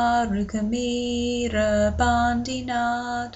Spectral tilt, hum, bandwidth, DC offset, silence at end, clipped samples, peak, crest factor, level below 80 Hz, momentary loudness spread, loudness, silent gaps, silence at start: -5 dB/octave; none; 8.2 kHz; under 0.1%; 0 s; under 0.1%; -10 dBFS; 14 dB; -38 dBFS; 5 LU; -24 LUFS; none; 0 s